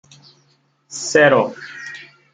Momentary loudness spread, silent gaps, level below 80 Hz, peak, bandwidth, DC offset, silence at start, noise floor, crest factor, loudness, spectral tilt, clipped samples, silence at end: 21 LU; none; -64 dBFS; -2 dBFS; 9.6 kHz; under 0.1%; 0.9 s; -60 dBFS; 18 dB; -16 LUFS; -3.5 dB/octave; under 0.1%; 0.3 s